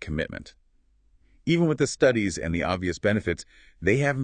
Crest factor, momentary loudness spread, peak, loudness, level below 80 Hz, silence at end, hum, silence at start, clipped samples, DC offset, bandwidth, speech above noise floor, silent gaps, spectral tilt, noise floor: 20 dB; 12 LU; -6 dBFS; -25 LUFS; -48 dBFS; 0 s; none; 0 s; under 0.1%; under 0.1%; 9.6 kHz; 38 dB; none; -5.5 dB/octave; -63 dBFS